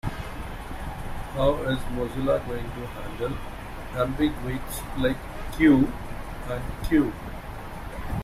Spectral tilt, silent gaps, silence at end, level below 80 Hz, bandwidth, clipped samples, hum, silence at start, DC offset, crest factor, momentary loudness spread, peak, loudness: -6.5 dB/octave; none; 0 s; -36 dBFS; 16 kHz; under 0.1%; none; 0.05 s; under 0.1%; 18 dB; 16 LU; -8 dBFS; -28 LUFS